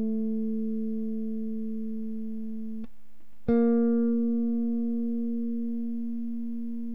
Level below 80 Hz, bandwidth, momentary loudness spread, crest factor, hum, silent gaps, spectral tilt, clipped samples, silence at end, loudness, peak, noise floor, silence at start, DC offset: -60 dBFS; 2.3 kHz; 12 LU; 14 dB; none; none; -11 dB/octave; under 0.1%; 0 s; -30 LUFS; -14 dBFS; -64 dBFS; 0 s; 2%